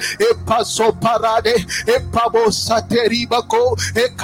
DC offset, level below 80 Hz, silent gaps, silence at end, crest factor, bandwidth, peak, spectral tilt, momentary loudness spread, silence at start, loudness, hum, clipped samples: under 0.1%; -42 dBFS; none; 0 s; 14 dB; 17 kHz; -2 dBFS; -3.5 dB/octave; 3 LU; 0 s; -16 LUFS; none; under 0.1%